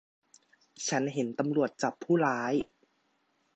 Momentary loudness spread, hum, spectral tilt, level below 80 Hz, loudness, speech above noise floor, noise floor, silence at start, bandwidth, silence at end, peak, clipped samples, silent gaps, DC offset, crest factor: 7 LU; none; -5 dB/octave; -72 dBFS; -30 LUFS; 44 dB; -74 dBFS; 0.8 s; 8.8 kHz; 0.9 s; -12 dBFS; under 0.1%; none; under 0.1%; 20 dB